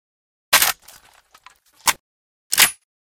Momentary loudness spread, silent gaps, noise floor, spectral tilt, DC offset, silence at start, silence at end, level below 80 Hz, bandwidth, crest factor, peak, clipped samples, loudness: 13 LU; 2.00-2.50 s; -52 dBFS; 2 dB/octave; under 0.1%; 0.5 s; 0.4 s; -58 dBFS; over 20 kHz; 24 dB; 0 dBFS; under 0.1%; -17 LUFS